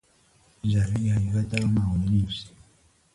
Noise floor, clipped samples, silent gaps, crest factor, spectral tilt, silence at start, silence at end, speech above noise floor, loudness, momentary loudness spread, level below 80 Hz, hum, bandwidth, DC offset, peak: -61 dBFS; under 0.1%; none; 18 dB; -7 dB/octave; 0.65 s; 0.65 s; 38 dB; -26 LUFS; 8 LU; -40 dBFS; none; 11.5 kHz; under 0.1%; -8 dBFS